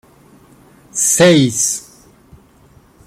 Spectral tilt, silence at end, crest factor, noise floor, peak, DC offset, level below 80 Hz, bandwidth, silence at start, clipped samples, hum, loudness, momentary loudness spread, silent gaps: -3.5 dB/octave; 1.25 s; 16 dB; -48 dBFS; 0 dBFS; under 0.1%; -52 dBFS; 16.5 kHz; 0.95 s; under 0.1%; none; -13 LUFS; 14 LU; none